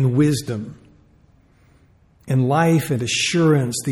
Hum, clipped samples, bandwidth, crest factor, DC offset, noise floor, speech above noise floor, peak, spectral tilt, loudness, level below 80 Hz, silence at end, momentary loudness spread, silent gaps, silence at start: none; under 0.1%; 17 kHz; 14 dB; under 0.1%; -54 dBFS; 36 dB; -6 dBFS; -5.5 dB/octave; -19 LUFS; -54 dBFS; 0 s; 11 LU; none; 0 s